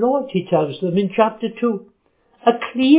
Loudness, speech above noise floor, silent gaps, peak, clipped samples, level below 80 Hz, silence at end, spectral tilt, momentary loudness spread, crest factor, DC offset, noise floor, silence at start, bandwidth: -20 LUFS; 42 dB; none; -2 dBFS; under 0.1%; -66 dBFS; 0 s; -11 dB/octave; 4 LU; 16 dB; under 0.1%; -59 dBFS; 0 s; 4 kHz